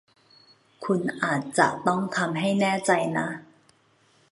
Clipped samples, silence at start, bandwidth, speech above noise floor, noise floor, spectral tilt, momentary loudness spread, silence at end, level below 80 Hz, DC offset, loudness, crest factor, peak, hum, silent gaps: under 0.1%; 0.8 s; 11.5 kHz; 38 dB; -63 dBFS; -5 dB/octave; 8 LU; 0.85 s; -70 dBFS; under 0.1%; -25 LUFS; 24 dB; -4 dBFS; none; none